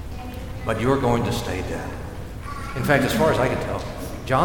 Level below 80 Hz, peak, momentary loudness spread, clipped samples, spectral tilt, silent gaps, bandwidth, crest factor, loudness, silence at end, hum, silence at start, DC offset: -36 dBFS; -4 dBFS; 15 LU; under 0.1%; -6 dB/octave; none; 19 kHz; 18 dB; -23 LUFS; 0 s; none; 0 s; under 0.1%